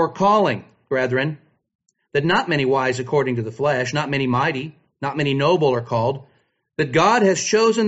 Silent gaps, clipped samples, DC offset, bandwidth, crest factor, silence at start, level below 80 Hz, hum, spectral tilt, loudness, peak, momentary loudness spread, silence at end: 1.75-1.79 s; under 0.1%; under 0.1%; 8 kHz; 16 dB; 0 s; -58 dBFS; none; -4 dB/octave; -20 LUFS; -4 dBFS; 11 LU; 0 s